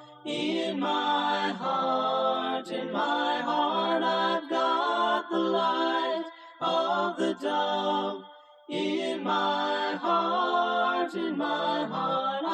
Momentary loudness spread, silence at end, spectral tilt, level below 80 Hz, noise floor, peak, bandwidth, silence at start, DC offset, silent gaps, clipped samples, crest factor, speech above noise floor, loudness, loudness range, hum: 5 LU; 0 s; -4.5 dB/octave; -82 dBFS; -50 dBFS; -14 dBFS; 9.6 kHz; 0 s; under 0.1%; none; under 0.1%; 14 dB; 22 dB; -28 LUFS; 2 LU; none